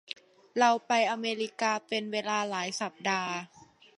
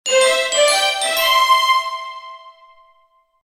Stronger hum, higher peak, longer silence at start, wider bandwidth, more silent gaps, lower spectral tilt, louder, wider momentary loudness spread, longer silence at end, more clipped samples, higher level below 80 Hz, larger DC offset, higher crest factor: neither; second, -10 dBFS vs -2 dBFS; about the same, 0.1 s vs 0.05 s; second, 11.5 kHz vs 19 kHz; neither; first, -3 dB/octave vs 3.5 dB/octave; second, -30 LUFS vs -14 LUFS; second, 12 LU vs 16 LU; second, 0.35 s vs 0.95 s; neither; second, -82 dBFS vs -66 dBFS; neither; about the same, 20 dB vs 16 dB